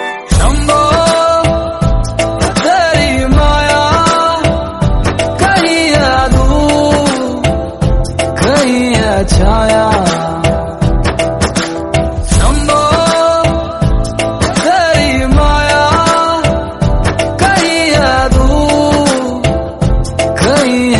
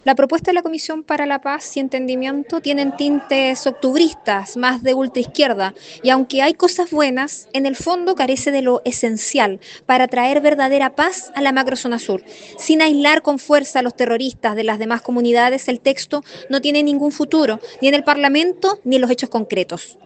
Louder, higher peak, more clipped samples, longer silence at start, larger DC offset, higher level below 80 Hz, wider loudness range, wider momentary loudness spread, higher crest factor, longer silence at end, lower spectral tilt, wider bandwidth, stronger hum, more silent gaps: first, -11 LUFS vs -17 LUFS; about the same, 0 dBFS vs 0 dBFS; neither; about the same, 0 s vs 0.05 s; neither; first, -18 dBFS vs -60 dBFS; about the same, 2 LU vs 2 LU; second, 5 LU vs 8 LU; second, 10 dB vs 16 dB; second, 0 s vs 0.15 s; first, -5 dB/octave vs -3 dB/octave; first, 12 kHz vs 9.2 kHz; neither; neither